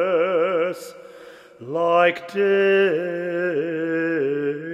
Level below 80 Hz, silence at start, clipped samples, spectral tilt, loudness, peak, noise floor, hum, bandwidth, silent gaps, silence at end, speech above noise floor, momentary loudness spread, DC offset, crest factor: -76 dBFS; 0 s; under 0.1%; -6 dB/octave; -21 LUFS; -4 dBFS; -44 dBFS; none; 13.5 kHz; none; 0 s; 23 dB; 10 LU; under 0.1%; 16 dB